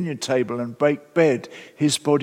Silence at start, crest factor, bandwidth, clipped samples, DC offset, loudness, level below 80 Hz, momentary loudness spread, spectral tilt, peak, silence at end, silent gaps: 0 s; 18 dB; 16 kHz; under 0.1%; under 0.1%; -22 LUFS; -72 dBFS; 8 LU; -5 dB/octave; -4 dBFS; 0 s; none